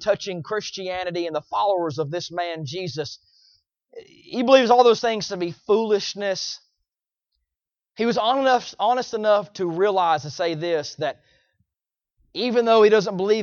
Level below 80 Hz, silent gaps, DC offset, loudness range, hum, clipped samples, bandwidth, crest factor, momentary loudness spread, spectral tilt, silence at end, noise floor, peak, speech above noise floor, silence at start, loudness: -66 dBFS; none; under 0.1%; 6 LU; none; under 0.1%; 7.2 kHz; 20 dB; 13 LU; -4.5 dB/octave; 0 s; -88 dBFS; -2 dBFS; 67 dB; 0 s; -22 LUFS